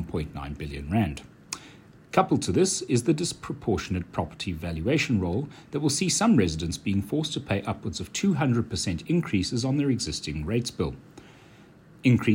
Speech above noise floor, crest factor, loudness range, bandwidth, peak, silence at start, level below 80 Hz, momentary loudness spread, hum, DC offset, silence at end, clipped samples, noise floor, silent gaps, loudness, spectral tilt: 26 dB; 20 dB; 2 LU; 16 kHz; -6 dBFS; 0 s; -46 dBFS; 10 LU; none; under 0.1%; 0 s; under 0.1%; -52 dBFS; none; -27 LUFS; -5 dB/octave